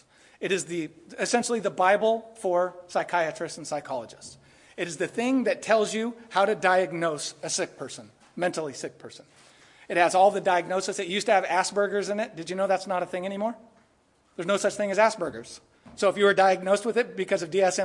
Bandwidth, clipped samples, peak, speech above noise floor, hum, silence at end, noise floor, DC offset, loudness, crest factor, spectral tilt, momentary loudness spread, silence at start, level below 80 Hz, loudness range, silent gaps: 11.5 kHz; under 0.1%; -6 dBFS; 39 dB; none; 0 s; -65 dBFS; under 0.1%; -26 LUFS; 20 dB; -3.5 dB/octave; 17 LU; 0.4 s; -72 dBFS; 4 LU; none